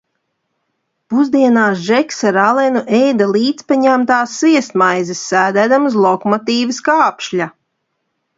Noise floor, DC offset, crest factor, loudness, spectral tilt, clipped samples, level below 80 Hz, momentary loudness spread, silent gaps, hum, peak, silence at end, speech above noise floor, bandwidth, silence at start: -70 dBFS; under 0.1%; 14 dB; -13 LUFS; -4.5 dB/octave; under 0.1%; -64 dBFS; 5 LU; none; none; 0 dBFS; 0.9 s; 57 dB; 7.8 kHz; 1.1 s